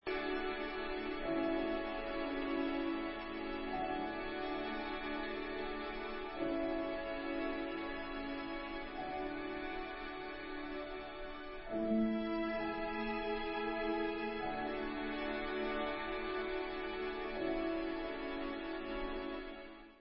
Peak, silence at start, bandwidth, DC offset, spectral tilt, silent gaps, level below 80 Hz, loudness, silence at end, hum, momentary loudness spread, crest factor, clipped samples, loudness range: -24 dBFS; 0.05 s; 5.6 kHz; under 0.1%; -2.5 dB/octave; none; -56 dBFS; -40 LUFS; 0 s; none; 6 LU; 14 dB; under 0.1%; 4 LU